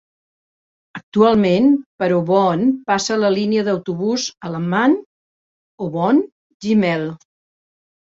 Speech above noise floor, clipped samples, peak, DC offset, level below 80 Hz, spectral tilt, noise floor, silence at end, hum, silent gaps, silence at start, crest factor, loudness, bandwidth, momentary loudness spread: over 74 dB; under 0.1%; -2 dBFS; under 0.1%; -58 dBFS; -5.5 dB/octave; under -90 dBFS; 0.95 s; none; 1.03-1.12 s, 1.86-1.98 s, 5.06-5.78 s, 6.32-6.60 s; 0.95 s; 16 dB; -17 LUFS; 7.8 kHz; 12 LU